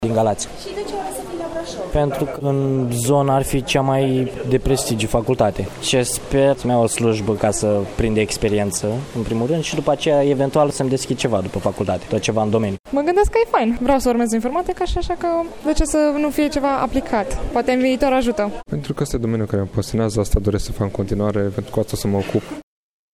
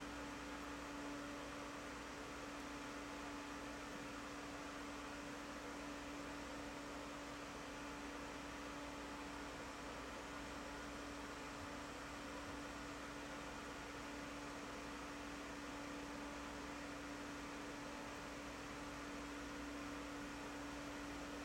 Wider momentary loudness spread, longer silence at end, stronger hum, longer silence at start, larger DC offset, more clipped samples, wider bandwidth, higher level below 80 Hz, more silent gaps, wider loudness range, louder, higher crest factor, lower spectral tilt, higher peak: first, 7 LU vs 1 LU; first, 0.55 s vs 0 s; neither; about the same, 0 s vs 0 s; neither; neither; first, 19 kHz vs 16 kHz; first, -32 dBFS vs -64 dBFS; first, 12.80-12.84 s vs none; first, 3 LU vs 0 LU; first, -20 LUFS vs -50 LUFS; about the same, 16 dB vs 12 dB; first, -5.5 dB/octave vs -3.5 dB/octave; first, -2 dBFS vs -38 dBFS